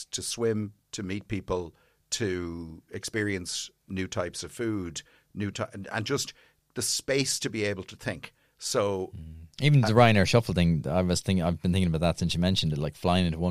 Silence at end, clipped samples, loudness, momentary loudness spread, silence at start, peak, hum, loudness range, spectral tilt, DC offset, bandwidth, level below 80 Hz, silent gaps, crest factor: 0 s; under 0.1%; -28 LUFS; 15 LU; 0 s; -6 dBFS; none; 9 LU; -5 dB/octave; under 0.1%; 15 kHz; -48 dBFS; none; 22 dB